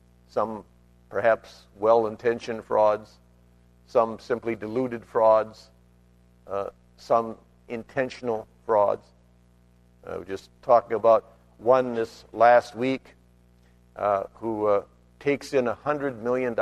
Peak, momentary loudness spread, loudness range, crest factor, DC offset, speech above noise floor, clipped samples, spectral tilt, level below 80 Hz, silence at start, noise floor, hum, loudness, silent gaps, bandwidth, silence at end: -6 dBFS; 14 LU; 6 LU; 20 dB; under 0.1%; 34 dB; under 0.1%; -6.5 dB/octave; -60 dBFS; 0.35 s; -58 dBFS; 60 Hz at -55 dBFS; -25 LUFS; none; 11.5 kHz; 0 s